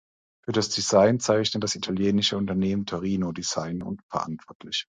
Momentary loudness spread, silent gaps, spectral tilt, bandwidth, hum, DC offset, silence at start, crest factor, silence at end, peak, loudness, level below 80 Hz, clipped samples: 12 LU; 4.03-4.09 s, 4.55-4.60 s; -4.5 dB/octave; 9.6 kHz; none; under 0.1%; 0.5 s; 18 dB; 0.05 s; -6 dBFS; -25 LUFS; -54 dBFS; under 0.1%